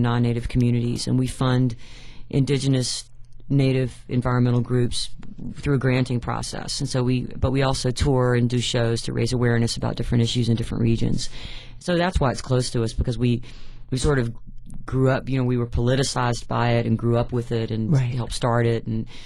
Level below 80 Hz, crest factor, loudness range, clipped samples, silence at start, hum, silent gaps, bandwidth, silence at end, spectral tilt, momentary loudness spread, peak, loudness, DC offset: -36 dBFS; 14 dB; 2 LU; under 0.1%; 0 s; none; none; 11.5 kHz; 0 s; -6 dB/octave; 8 LU; -8 dBFS; -23 LUFS; under 0.1%